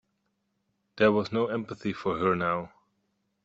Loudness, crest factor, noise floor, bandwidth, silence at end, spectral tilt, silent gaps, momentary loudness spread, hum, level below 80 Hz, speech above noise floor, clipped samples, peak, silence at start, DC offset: -28 LUFS; 22 dB; -77 dBFS; 7.8 kHz; 0.75 s; -7 dB/octave; none; 10 LU; none; -64 dBFS; 50 dB; under 0.1%; -8 dBFS; 0.95 s; under 0.1%